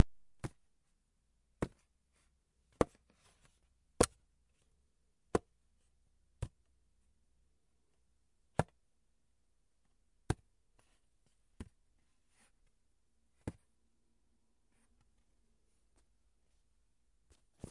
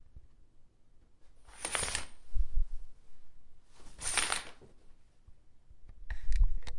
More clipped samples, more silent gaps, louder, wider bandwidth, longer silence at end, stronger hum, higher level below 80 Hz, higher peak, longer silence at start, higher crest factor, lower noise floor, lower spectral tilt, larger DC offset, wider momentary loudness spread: neither; neither; second, -40 LUFS vs -36 LUFS; about the same, 11.5 kHz vs 11.5 kHz; first, 4.2 s vs 0 s; neither; second, -60 dBFS vs -38 dBFS; about the same, -8 dBFS vs -10 dBFS; second, 0 s vs 0.15 s; first, 36 dB vs 22 dB; first, -80 dBFS vs -58 dBFS; first, -5 dB/octave vs -1.5 dB/octave; neither; about the same, 20 LU vs 20 LU